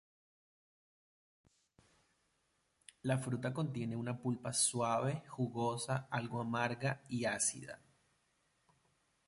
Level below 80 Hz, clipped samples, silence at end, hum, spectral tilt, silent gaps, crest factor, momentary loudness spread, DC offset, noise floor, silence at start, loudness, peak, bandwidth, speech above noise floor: -74 dBFS; under 0.1%; 1.5 s; none; -4.5 dB/octave; none; 22 dB; 7 LU; under 0.1%; -80 dBFS; 3.05 s; -37 LUFS; -18 dBFS; 11.5 kHz; 42 dB